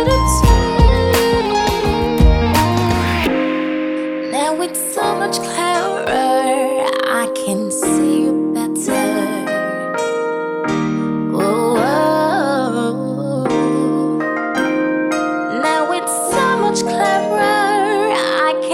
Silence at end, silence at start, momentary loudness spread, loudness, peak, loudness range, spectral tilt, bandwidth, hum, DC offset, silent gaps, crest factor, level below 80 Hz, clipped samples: 0 s; 0 s; 6 LU; -16 LUFS; 0 dBFS; 3 LU; -5 dB/octave; 16.5 kHz; none; under 0.1%; none; 16 dB; -24 dBFS; under 0.1%